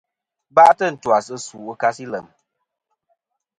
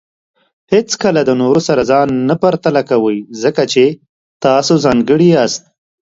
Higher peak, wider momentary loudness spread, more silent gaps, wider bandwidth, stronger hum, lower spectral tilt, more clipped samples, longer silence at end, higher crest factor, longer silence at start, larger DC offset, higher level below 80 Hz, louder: about the same, 0 dBFS vs 0 dBFS; first, 19 LU vs 6 LU; second, none vs 4.09-4.40 s; first, 11 kHz vs 7.8 kHz; neither; second, -4 dB/octave vs -5.5 dB/octave; neither; first, 1.4 s vs 0.55 s; first, 20 dB vs 12 dB; second, 0.55 s vs 0.7 s; neither; second, -66 dBFS vs -48 dBFS; second, -17 LUFS vs -12 LUFS